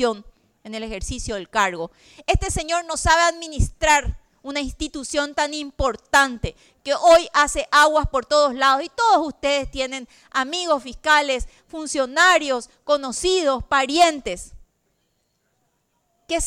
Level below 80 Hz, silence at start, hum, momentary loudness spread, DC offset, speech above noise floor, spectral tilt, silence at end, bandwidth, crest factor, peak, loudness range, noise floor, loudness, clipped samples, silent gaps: -36 dBFS; 0 s; none; 16 LU; under 0.1%; 49 dB; -3 dB/octave; 0 s; 17.5 kHz; 16 dB; -6 dBFS; 5 LU; -70 dBFS; -20 LUFS; under 0.1%; none